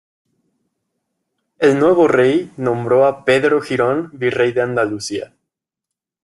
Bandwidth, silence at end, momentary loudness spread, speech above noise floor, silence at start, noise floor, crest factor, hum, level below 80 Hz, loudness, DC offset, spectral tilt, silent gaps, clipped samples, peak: 12 kHz; 1 s; 9 LU; 68 dB; 1.6 s; -83 dBFS; 16 dB; none; -60 dBFS; -16 LUFS; under 0.1%; -6 dB/octave; none; under 0.1%; -2 dBFS